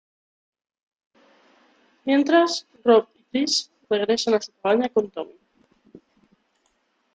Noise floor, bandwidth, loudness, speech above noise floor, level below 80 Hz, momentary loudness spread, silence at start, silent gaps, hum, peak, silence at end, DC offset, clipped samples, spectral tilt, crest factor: -69 dBFS; 9.2 kHz; -22 LUFS; 48 dB; -72 dBFS; 13 LU; 2.05 s; none; none; -6 dBFS; 1.9 s; under 0.1%; under 0.1%; -3 dB/octave; 20 dB